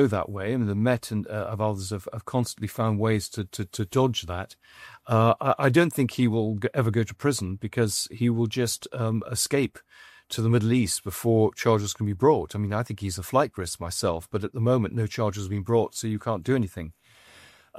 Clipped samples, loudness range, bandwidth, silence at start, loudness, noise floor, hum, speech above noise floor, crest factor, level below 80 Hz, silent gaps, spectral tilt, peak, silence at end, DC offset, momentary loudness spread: under 0.1%; 3 LU; 15 kHz; 0 s; -26 LUFS; -53 dBFS; none; 28 dB; 20 dB; -54 dBFS; none; -5.5 dB/octave; -6 dBFS; 0 s; under 0.1%; 10 LU